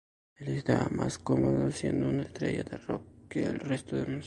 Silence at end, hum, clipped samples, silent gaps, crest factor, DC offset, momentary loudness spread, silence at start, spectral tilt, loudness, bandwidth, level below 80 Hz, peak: 0 s; none; under 0.1%; none; 20 dB; under 0.1%; 9 LU; 0.4 s; -7 dB/octave; -32 LUFS; 11.5 kHz; -54 dBFS; -12 dBFS